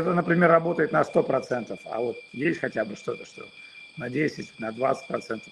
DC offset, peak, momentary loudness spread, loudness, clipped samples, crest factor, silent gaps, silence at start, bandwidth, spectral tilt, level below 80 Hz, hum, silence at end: under 0.1%; -6 dBFS; 17 LU; -26 LUFS; under 0.1%; 20 dB; none; 0 s; 11 kHz; -7 dB/octave; -68 dBFS; none; 0 s